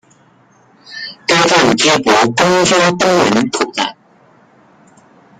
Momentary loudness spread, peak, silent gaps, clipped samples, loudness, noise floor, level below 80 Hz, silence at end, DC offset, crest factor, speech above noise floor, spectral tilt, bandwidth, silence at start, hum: 11 LU; 0 dBFS; none; under 0.1%; -12 LUFS; -49 dBFS; -50 dBFS; 1.45 s; under 0.1%; 14 dB; 37 dB; -3.5 dB/octave; 15.5 kHz; 0.9 s; none